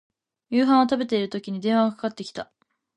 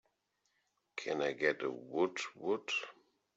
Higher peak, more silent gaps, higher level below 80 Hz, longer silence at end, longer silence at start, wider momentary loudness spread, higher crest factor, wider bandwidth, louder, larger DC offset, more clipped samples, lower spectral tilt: first, -6 dBFS vs -18 dBFS; neither; first, -68 dBFS vs -84 dBFS; about the same, 0.55 s vs 0.45 s; second, 0.5 s vs 0.95 s; first, 16 LU vs 10 LU; about the same, 18 dB vs 20 dB; first, 9.8 kHz vs 8 kHz; first, -23 LUFS vs -37 LUFS; neither; neither; first, -6 dB/octave vs -3.5 dB/octave